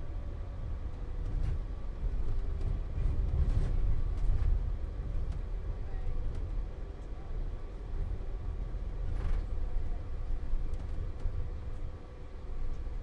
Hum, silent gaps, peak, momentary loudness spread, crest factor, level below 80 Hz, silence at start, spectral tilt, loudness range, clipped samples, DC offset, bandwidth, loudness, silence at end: none; none; -18 dBFS; 10 LU; 14 dB; -34 dBFS; 0 s; -8.5 dB/octave; 6 LU; under 0.1%; under 0.1%; 4.9 kHz; -39 LUFS; 0 s